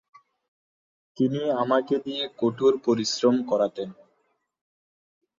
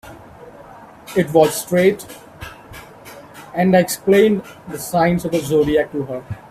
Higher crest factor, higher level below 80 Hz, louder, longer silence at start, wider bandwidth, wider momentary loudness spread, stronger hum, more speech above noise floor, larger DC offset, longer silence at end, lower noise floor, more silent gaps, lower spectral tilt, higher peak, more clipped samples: about the same, 20 dB vs 18 dB; second, -72 dBFS vs -48 dBFS; second, -24 LUFS vs -17 LUFS; first, 1.2 s vs 0.05 s; second, 7.6 kHz vs 16 kHz; second, 6 LU vs 23 LU; neither; first, 48 dB vs 24 dB; neither; first, 1.45 s vs 0.15 s; first, -72 dBFS vs -40 dBFS; neither; about the same, -5 dB/octave vs -5.5 dB/octave; second, -8 dBFS vs 0 dBFS; neither